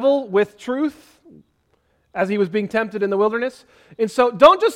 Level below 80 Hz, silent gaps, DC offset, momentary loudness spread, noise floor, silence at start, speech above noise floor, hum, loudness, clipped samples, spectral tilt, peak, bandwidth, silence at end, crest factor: -56 dBFS; none; under 0.1%; 13 LU; -64 dBFS; 0 s; 46 dB; none; -19 LUFS; under 0.1%; -5.5 dB/octave; 0 dBFS; 14.5 kHz; 0 s; 20 dB